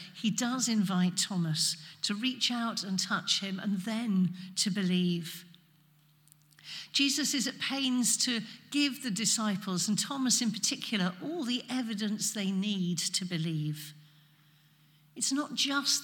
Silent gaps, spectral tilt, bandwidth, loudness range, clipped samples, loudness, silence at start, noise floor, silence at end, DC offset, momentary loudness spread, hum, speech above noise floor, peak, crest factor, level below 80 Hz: none; -3 dB/octave; 18 kHz; 4 LU; under 0.1%; -30 LUFS; 0 s; -64 dBFS; 0 s; under 0.1%; 7 LU; none; 33 dB; -14 dBFS; 18 dB; -88 dBFS